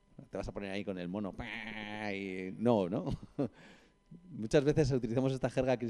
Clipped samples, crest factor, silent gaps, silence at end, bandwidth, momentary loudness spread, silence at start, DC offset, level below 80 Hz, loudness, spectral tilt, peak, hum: under 0.1%; 20 dB; none; 0 s; 11 kHz; 11 LU; 0.2 s; under 0.1%; -54 dBFS; -35 LUFS; -7 dB/octave; -14 dBFS; none